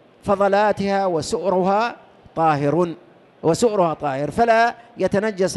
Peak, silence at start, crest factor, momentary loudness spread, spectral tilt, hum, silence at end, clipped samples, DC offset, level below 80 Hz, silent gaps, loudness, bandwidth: -6 dBFS; 0.25 s; 14 dB; 8 LU; -5.5 dB/octave; none; 0 s; under 0.1%; under 0.1%; -52 dBFS; none; -20 LUFS; 12.5 kHz